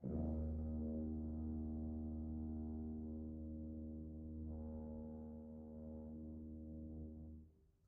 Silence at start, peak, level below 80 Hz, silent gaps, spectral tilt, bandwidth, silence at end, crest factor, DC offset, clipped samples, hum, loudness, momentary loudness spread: 0 s; -32 dBFS; -52 dBFS; none; -13.5 dB/octave; 1.6 kHz; 0.25 s; 14 dB; under 0.1%; under 0.1%; none; -49 LUFS; 9 LU